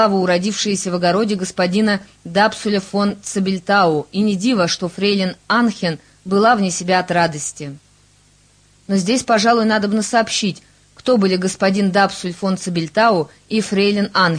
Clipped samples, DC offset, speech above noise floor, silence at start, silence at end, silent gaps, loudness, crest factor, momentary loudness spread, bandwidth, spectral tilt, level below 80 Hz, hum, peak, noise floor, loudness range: under 0.1%; under 0.1%; 36 dB; 0 s; 0 s; none; -17 LUFS; 16 dB; 7 LU; 10.5 kHz; -4.5 dB/octave; -56 dBFS; 50 Hz at -55 dBFS; 0 dBFS; -53 dBFS; 2 LU